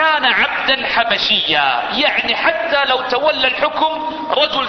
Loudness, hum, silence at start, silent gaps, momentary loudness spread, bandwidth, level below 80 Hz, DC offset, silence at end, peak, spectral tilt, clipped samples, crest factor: -15 LUFS; none; 0 s; none; 4 LU; 6.4 kHz; -50 dBFS; under 0.1%; 0 s; 0 dBFS; -3 dB/octave; under 0.1%; 16 dB